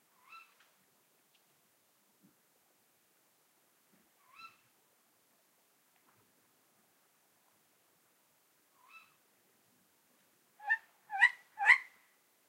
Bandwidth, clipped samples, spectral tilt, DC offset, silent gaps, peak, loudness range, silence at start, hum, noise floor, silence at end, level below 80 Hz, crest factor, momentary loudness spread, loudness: 16 kHz; under 0.1%; 1.5 dB/octave; under 0.1%; none; -12 dBFS; 11 LU; 10.65 s; none; -73 dBFS; 0.65 s; under -90 dBFS; 30 dB; 30 LU; -30 LUFS